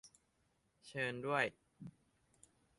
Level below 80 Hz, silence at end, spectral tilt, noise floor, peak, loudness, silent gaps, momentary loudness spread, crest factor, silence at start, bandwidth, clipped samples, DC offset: -80 dBFS; 0.9 s; -5 dB/octave; -79 dBFS; -20 dBFS; -40 LUFS; none; 20 LU; 24 dB; 0.05 s; 11.5 kHz; under 0.1%; under 0.1%